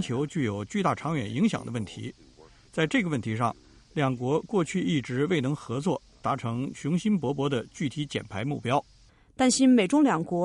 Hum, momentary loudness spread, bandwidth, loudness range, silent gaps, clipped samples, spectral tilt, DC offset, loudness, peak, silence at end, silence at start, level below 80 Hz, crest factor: none; 10 LU; 11.5 kHz; 4 LU; none; under 0.1%; -5.5 dB/octave; under 0.1%; -27 LUFS; -10 dBFS; 0 s; 0 s; -60 dBFS; 18 dB